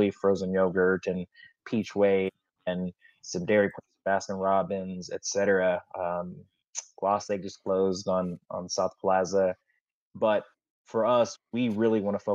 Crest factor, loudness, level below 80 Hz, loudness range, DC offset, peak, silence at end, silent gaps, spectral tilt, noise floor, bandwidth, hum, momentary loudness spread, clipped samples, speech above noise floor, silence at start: 16 dB; -28 LUFS; -70 dBFS; 2 LU; under 0.1%; -12 dBFS; 0 s; 6.68-6.73 s, 9.81-9.86 s, 9.92-10.11 s, 10.70-10.85 s; -5 dB/octave; -77 dBFS; 7.8 kHz; none; 12 LU; under 0.1%; 50 dB; 0 s